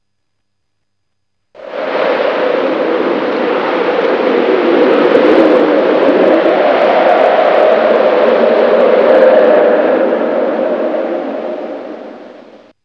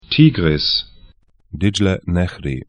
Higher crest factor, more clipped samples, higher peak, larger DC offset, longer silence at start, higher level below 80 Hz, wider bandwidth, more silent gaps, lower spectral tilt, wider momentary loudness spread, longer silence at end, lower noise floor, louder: second, 10 dB vs 18 dB; first, 0.3% vs under 0.1%; about the same, 0 dBFS vs 0 dBFS; neither; first, 1.55 s vs 0.1 s; second, -62 dBFS vs -36 dBFS; second, 6.4 kHz vs 10 kHz; neither; about the same, -6.5 dB/octave vs -6 dB/octave; about the same, 11 LU vs 11 LU; first, 0.5 s vs 0.05 s; first, -72 dBFS vs -48 dBFS; first, -10 LUFS vs -17 LUFS